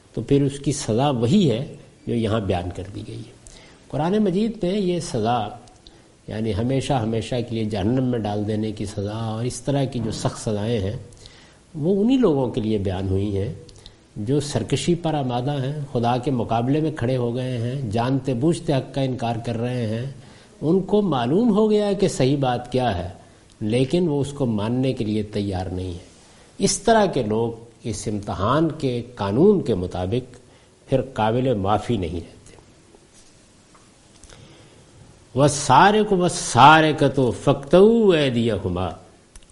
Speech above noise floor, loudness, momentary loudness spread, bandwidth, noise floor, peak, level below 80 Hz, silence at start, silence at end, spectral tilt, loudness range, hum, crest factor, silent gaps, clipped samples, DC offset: 31 dB; -21 LUFS; 12 LU; 11.5 kHz; -51 dBFS; 0 dBFS; -46 dBFS; 0.15 s; 0.15 s; -6 dB/octave; 8 LU; none; 22 dB; none; under 0.1%; under 0.1%